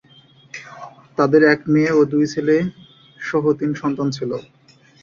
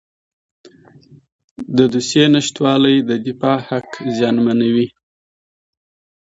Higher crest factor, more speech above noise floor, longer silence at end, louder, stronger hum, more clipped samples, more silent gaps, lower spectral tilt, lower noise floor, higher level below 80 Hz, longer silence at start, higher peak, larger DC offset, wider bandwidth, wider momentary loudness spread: about the same, 18 dB vs 18 dB; about the same, 33 dB vs 31 dB; second, 0.6 s vs 1.35 s; second, -18 LUFS vs -15 LUFS; neither; neither; neither; first, -7 dB/octave vs -5.5 dB/octave; first, -50 dBFS vs -45 dBFS; about the same, -58 dBFS vs -58 dBFS; second, 0.55 s vs 1.6 s; about the same, -2 dBFS vs 0 dBFS; neither; about the same, 7.4 kHz vs 8 kHz; first, 21 LU vs 10 LU